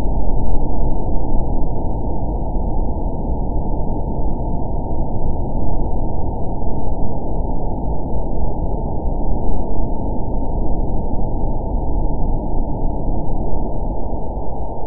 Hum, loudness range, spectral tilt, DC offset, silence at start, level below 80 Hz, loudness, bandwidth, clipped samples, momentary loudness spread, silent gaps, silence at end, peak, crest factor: none; 1 LU; -17.5 dB/octave; 4%; 0 s; -20 dBFS; -24 LUFS; 1.1 kHz; under 0.1%; 2 LU; none; 0 s; 0 dBFS; 12 dB